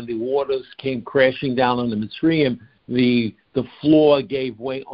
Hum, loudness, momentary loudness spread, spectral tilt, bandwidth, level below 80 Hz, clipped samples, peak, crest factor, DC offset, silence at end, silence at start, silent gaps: none; -20 LUFS; 11 LU; -11 dB/octave; 5.4 kHz; -54 dBFS; under 0.1%; -2 dBFS; 18 dB; under 0.1%; 0 s; 0 s; none